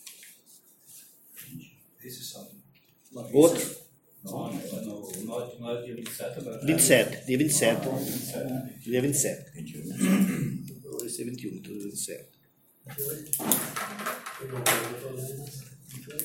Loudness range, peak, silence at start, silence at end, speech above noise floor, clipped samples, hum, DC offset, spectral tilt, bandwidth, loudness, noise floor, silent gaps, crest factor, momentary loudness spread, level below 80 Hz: 7 LU; -2 dBFS; 0 s; 0 s; 35 dB; under 0.1%; none; under 0.1%; -4 dB/octave; 17 kHz; -28 LUFS; -63 dBFS; none; 28 dB; 23 LU; -66 dBFS